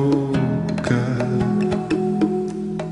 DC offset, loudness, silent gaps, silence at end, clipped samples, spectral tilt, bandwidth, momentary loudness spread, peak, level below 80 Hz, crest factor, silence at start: under 0.1%; -21 LUFS; none; 0 s; under 0.1%; -8 dB/octave; 11 kHz; 4 LU; -6 dBFS; -46 dBFS; 16 dB; 0 s